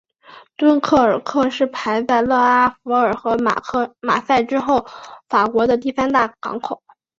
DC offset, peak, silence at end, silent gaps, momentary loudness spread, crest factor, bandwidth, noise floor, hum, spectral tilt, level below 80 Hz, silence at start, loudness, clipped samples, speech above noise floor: under 0.1%; -2 dBFS; 0.45 s; none; 10 LU; 16 dB; 7.6 kHz; -45 dBFS; none; -5 dB/octave; -54 dBFS; 0.3 s; -18 LUFS; under 0.1%; 28 dB